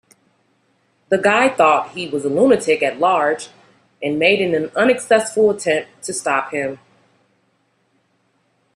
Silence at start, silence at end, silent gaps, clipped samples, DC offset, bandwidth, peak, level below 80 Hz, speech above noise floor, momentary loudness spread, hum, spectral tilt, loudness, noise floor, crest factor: 1.1 s; 2 s; none; under 0.1%; under 0.1%; 12.5 kHz; 0 dBFS; -64 dBFS; 47 dB; 11 LU; none; -4 dB/octave; -17 LUFS; -64 dBFS; 18 dB